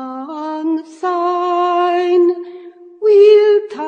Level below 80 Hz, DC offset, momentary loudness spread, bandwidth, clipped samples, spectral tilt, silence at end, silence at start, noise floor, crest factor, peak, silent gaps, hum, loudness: -78 dBFS; under 0.1%; 17 LU; 7 kHz; under 0.1%; -4 dB/octave; 0 s; 0 s; -36 dBFS; 14 dB; 0 dBFS; none; none; -14 LUFS